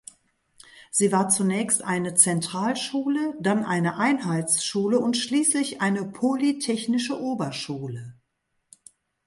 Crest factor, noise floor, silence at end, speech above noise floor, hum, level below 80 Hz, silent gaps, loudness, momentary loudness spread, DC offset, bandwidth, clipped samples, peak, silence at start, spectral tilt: 22 dB; -76 dBFS; 1.15 s; 52 dB; none; -68 dBFS; none; -23 LUFS; 8 LU; under 0.1%; 12 kHz; under 0.1%; -2 dBFS; 0.75 s; -3.5 dB/octave